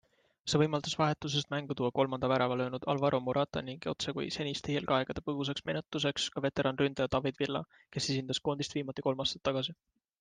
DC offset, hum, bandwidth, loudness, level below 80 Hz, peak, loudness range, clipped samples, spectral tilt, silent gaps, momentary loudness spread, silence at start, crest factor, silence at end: under 0.1%; none; 9.8 kHz; -33 LUFS; -62 dBFS; -14 dBFS; 2 LU; under 0.1%; -5 dB/octave; none; 6 LU; 0.45 s; 20 dB; 0.45 s